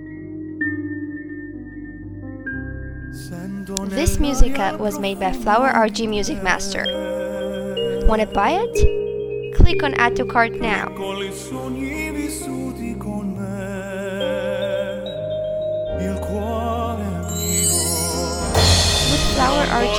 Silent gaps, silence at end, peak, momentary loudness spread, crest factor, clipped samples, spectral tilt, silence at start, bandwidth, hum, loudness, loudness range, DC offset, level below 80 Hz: none; 0 s; 0 dBFS; 14 LU; 20 dB; under 0.1%; -4 dB/octave; 0 s; 18.5 kHz; none; -21 LUFS; 8 LU; under 0.1%; -28 dBFS